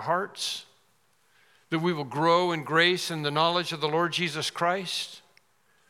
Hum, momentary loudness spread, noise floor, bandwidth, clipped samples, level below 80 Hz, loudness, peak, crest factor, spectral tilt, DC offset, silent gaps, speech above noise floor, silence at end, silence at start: none; 9 LU; -68 dBFS; 16 kHz; under 0.1%; -84 dBFS; -26 LUFS; -8 dBFS; 20 dB; -4 dB/octave; under 0.1%; none; 41 dB; 0.7 s; 0 s